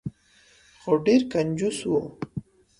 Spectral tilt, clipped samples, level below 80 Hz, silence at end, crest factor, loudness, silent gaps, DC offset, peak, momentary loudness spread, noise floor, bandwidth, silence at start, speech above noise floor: -6 dB/octave; under 0.1%; -58 dBFS; 0.4 s; 18 dB; -24 LUFS; none; under 0.1%; -8 dBFS; 18 LU; -58 dBFS; 11.5 kHz; 0.05 s; 35 dB